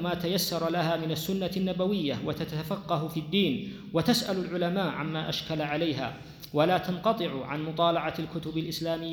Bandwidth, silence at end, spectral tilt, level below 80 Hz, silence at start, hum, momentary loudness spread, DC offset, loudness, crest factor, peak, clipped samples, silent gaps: over 20 kHz; 0 s; -5.5 dB/octave; -58 dBFS; 0 s; none; 7 LU; under 0.1%; -29 LUFS; 18 dB; -12 dBFS; under 0.1%; none